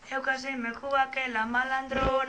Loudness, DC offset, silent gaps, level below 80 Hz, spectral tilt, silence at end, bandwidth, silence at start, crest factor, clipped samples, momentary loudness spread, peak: -29 LUFS; under 0.1%; none; -48 dBFS; -4.5 dB/octave; 0 s; 9.8 kHz; 0 s; 16 dB; under 0.1%; 4 LU; -14 dBFS